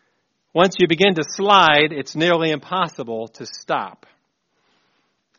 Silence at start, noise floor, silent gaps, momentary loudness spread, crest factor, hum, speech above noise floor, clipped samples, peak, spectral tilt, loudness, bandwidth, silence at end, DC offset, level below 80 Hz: 0.55 s; -69 dBFS; none; 16 LU; 20 dB; none; 51 dB; under 0.1%; 0 dBFS; -2.5 dB/octave; -18 LUFS; 7.2 kHz; 1.5 s; under 0.1%; -62 dBFS